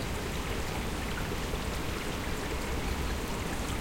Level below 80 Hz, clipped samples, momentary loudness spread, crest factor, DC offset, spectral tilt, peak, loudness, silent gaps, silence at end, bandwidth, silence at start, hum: -38 dBFS; under 0.1%; 1 LU; 14 dB; 0.1%; -4.5 dB/octave; -20 dBFS; -34 LUFS; none; 0 s; 17 kHz; 0 s; none